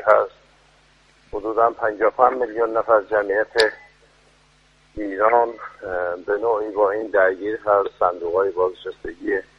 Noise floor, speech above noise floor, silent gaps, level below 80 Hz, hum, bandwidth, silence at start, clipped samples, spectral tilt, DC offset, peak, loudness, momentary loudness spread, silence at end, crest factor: -57 dBFS; 36 dB; none; -54 dBFS; none; 11.5 kHz; 0 s; under 0.1%; -4.5 dB/octave; under 0.1%; 0 dBFS; -20 LUFS; 12 LU; 0.15 s; 22 dB